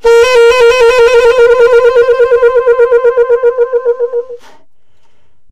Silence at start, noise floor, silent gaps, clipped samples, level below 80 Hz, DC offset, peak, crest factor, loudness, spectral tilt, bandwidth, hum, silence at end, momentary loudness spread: 0 s; -58 dBFS; none; under 0.1%; -36 dBFS; under 0.1%; 0 dBFS; 8 dB; -7 LUFS; -1.5 dB/octave; 11.5 kHz; none; 0.05 s; 7 LU